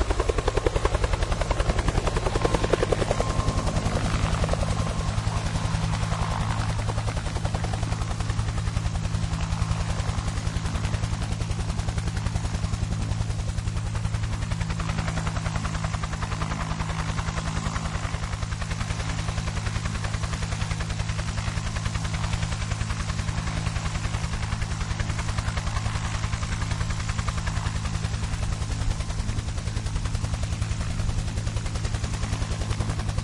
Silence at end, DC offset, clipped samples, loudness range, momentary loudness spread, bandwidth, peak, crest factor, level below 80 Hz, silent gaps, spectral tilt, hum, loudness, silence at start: 0 s; under 0.1%; under 0.1%; 4 LU; 4 LU; 11.5 kHz; -4 dBFS; 22 dB; -30 dBFS; none; -5 dB/octave; none; -28 LUFS; 0 s